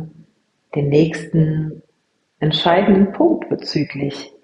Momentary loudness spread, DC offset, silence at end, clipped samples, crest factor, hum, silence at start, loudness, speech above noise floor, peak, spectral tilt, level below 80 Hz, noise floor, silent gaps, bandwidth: 12 LU; under 0.1%; 0.15 s; under 0.1%; 16 dB; none; 0 s; -17 LUFS; 50 dB; -2 dBFS; -7.5 dB/octave; -50 dBFS; -67 dBFS; none; 9.8 kHz